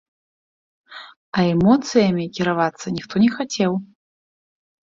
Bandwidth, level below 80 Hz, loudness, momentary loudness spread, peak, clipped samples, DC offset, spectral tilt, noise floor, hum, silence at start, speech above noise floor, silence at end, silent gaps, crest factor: 7.8 kHz; -54 dBFS; -20 LUFS; 13 LU; -2 dBFS; under 0.1%; under 0.1%; -6 dB/octave; under -90 dBFS; none; 0.9 s; over 71 dB; 1.1 s; 1.17-1.32 s; 18 dB